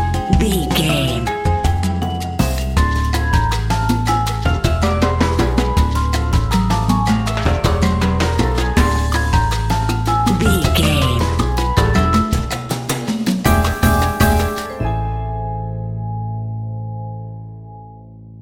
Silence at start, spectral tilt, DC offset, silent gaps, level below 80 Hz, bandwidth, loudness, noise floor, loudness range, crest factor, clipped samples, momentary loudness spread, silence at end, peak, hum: 0 s; -5.5 dB/octave; under 0.1%; none; -22 dBFS; 17 kHz; -17 LUFS; -37 dBFS; 4 LU; 16 dB; under 0.1%; 10 LU; 0 s; 0 dBFS; none